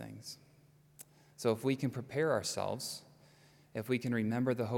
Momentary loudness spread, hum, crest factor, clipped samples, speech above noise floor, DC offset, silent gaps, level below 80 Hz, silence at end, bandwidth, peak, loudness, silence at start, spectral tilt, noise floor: 21 LU; none; 20 dB; under 0.1%; 30 dB; under 0.1%; none; -76 dBFS; 0 s; 18 kHz; -18 dBFS; -36 LUFS; 0 s; -5.5 dB/octave; -64 dBFS